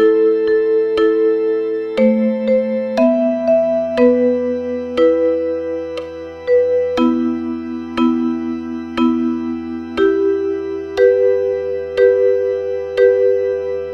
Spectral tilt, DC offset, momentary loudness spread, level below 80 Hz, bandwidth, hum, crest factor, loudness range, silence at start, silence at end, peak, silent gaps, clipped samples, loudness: -7 dB/octave; under 0.1%; 10 LU; -50 dBFS; 6.2 kHz; none; 14 dB; 3 LU; 0 s; 0 s; -2 dBFS; none; under 0.1%; -16 LUFS